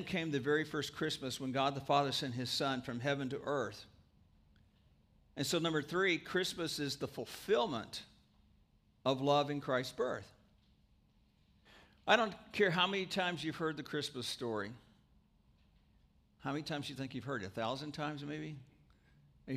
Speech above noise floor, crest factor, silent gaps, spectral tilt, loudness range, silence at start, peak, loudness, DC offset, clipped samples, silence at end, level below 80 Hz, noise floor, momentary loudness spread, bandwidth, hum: 34 dB; 26 dB; none; -4.5 dB/octave; 7 LU; 0 s; -14 dBFS; -37 LUFS; under 0.1%; under 0.1%; 0 s; -70 dBFS; -70 dBFS; 12 LU; 15.5 kHz; none